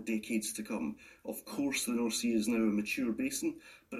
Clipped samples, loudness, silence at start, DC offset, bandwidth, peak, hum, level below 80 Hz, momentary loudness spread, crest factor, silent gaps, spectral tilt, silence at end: under 0.1%; -34 LUFS; 0 s; under 0.1%; 15 kHz; -20 dBFS; none; -66 dBFS; 11 LU; 14 dB; none; -3.5 dB/octave; 0 s